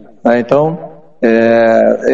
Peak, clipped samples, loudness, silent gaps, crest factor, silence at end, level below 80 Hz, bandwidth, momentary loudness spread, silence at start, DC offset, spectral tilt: 0 dBFS; 0.3%; -11 LUFS; none; 12 dB; 0 s; -54 dBFS; 7.4 kHz; 8 LU; 0.25 s; 0.9%; -7.5 dB/octave